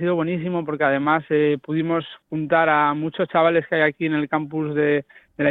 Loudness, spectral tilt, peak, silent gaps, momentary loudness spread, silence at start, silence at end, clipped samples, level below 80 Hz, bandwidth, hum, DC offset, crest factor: -21 LUFS; -10 dB/octave; -4 dBFS; none; 7 LU; 0 s; 0 s; under 0.1%; -62 dBFS; 4.1 kHz; none; under 0.1%; 16 dB